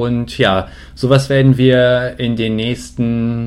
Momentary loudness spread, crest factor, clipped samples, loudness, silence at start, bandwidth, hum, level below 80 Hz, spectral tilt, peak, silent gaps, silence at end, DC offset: 9 LU; 14 dB; under 0.1%; -14 LUFS; 0 s; 12 kHz; none; -38 dBFS; -7 dB/octave; 0 dBFS; none; 0 s; under 0.1%